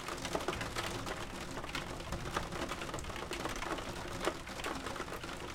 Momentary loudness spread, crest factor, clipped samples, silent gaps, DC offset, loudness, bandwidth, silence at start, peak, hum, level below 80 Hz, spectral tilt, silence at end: 4 LU; 22 dB; under 0.1%; none; under 0.1%; -40 LUFS; 16.5 kHz; 0 s; -18 dBFS; none; -50 dBFS; -3.5 dB/octave; 0 s